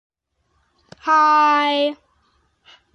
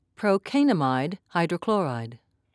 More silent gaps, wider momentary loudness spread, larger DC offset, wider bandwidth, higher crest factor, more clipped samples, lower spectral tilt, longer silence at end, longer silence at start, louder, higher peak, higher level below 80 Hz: neither; about the same, 10 LU vs 8 LU; neither; about the same, 10 kHz vs 11 kHz; about the same, 14 dB vs 16 dB; neither; second, -2.5 dB/octave vs -7 dB/octave; first, 1 s vs 0.4 s; first, 1.05 s vs 0.2 s; first, -16 LUFS vs -25 LUFS; first, -6 dBFS vs -10 dBFS; about the same, -68 dBFS vs -72 dBFS